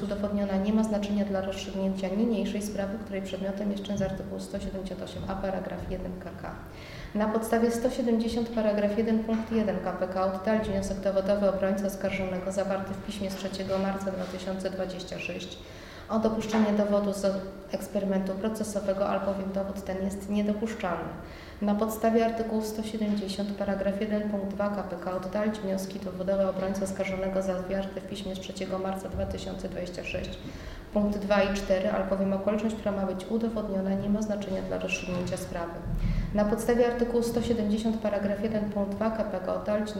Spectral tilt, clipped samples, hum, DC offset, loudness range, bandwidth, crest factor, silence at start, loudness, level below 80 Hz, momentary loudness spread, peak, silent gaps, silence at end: -6 dB/octave; under 0.1%; none; under 0.1%; 5 LU; 16 kHz; 18 dB; 0 s; -30 LUFS; -46 dBFS; 9 LU; -12 dBFS; none; 0 s